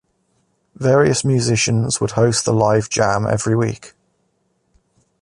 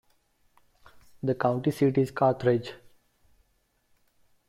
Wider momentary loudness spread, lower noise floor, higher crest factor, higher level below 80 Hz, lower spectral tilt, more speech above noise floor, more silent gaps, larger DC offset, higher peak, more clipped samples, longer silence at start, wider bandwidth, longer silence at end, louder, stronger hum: second, 5 LU vs 8 LU; second, -66 dBFS vs -71 dBFS; about the same, 16 dB vs 20 dB; first, -48 dBFS vs -64 dBFS; second, -5 dB/octave vs -8 dB/octave; first, 50 dB vs 46 dB; neither; neither; first, -2 dBFS vs -10 dBFS; neither; second, 0.8 s vs 1.25 s; second, 11.5 kHz vs 14 kHz; second, 1.35 s vs 1.75 s; first, -17 LUFS vs -26 LUFS; neither